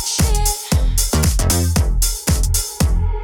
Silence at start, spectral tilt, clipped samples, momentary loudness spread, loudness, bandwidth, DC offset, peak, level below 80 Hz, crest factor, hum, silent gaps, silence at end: 0 s; -4 dB/octave; under 0.1%; 3 LU; -17 LUFS; 20 kHz; under 0.1%; -2 dBFS; -18 dBFS; 14 dB; none; none; 0 s